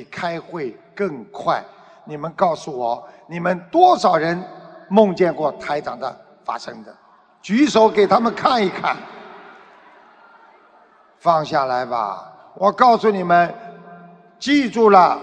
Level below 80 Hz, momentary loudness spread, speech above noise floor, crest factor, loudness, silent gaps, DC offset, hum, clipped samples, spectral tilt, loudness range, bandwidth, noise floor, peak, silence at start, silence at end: -62 dBFS; 17 LU; 34 dB; 20 dB; -18 LUFS; none; under 0.1%; none; under 0.1%; -5.5 dB/octave; 6 LU; 9.2 kHz; -52 dBFS; 0 dBFS; 0 s; 0 s